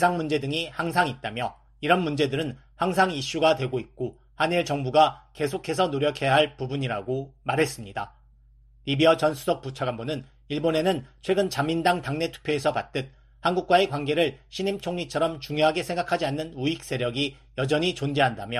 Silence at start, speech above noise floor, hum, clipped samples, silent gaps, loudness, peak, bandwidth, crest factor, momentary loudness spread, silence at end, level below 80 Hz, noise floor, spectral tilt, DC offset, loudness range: 0 s; 30 dB; none; under 0.1%; none; -26 LUFS; -6 dBFS; 13.5 kHz; 20 dB; 11 LU; 0 s; -54 dBFS; -55 dBFS; -5 dB/octave; under 0.1%; 2 LU